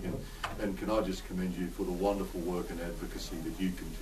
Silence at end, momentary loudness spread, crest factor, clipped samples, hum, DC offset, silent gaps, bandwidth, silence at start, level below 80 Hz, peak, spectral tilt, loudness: 0 s; 7 LU; 18 dB; under 0.1%; none; under 0.1%; none; 13.5 kHz; 0 s; -44 dBFS; -18 dBFS; -6 dB/octave; -36 LUFS